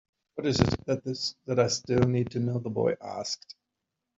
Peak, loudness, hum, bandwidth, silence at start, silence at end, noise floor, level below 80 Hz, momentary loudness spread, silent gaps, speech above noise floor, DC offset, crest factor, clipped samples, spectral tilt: -4 dBFS; -29 LUFS; none; 7.8 kHz; 0.35 s; 0.65 s; -85 dBFS; -54 dBFS; 9 LU; none; 57 dB; under 0.1%; 26 dB; under 0.1%; -5.5 dB/octave